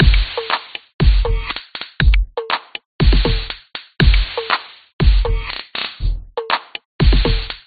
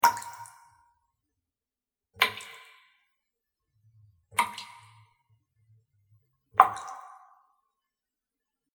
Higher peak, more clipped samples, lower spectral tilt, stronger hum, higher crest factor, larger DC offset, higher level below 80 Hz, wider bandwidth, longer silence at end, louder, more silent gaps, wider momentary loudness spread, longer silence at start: about the same, 0 dBFS vs 0 dBFS; neither; first, -4 dB/octave vs -0.5 dB/octave; neither; second, 16 dB vs 34 dB; neither; first, -18 dBFS vs -74 dBFS; second, 4.9 kHz vs over 20 kHz; second, 0.1 s vs 1.75 s; first, -19 LUFS vs -27 LUFS; first, 0.94-0.99 s, 2.85-2.99 s, 4.93-4.99 s, 6.85-6.99 s vs none; second, 12 LU vs 25 LU; about the same, 0 s vs 0.05 s